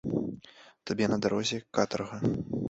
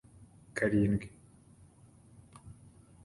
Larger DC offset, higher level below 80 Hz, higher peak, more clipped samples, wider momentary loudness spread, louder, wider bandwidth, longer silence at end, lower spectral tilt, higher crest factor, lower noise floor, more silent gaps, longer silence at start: neither; about the same, -58 dBFS vs -56 dBFS; first, -10 dBFS vs -16 dBFS; neither; second, 11 LU vs 26 LU; about the same, -31 LUFS vs -32 LUFS; second, 8 kHz vs 11.5 kHz; second, 0 s vs 0.5 s; second, -5.5 dB/octave vs -7.5 dB/octave; about the same, 22 dB vs 20 dB; second, -55 dBFS vs -59 dBFS; neither; second, 0.05 s vs 0.55 s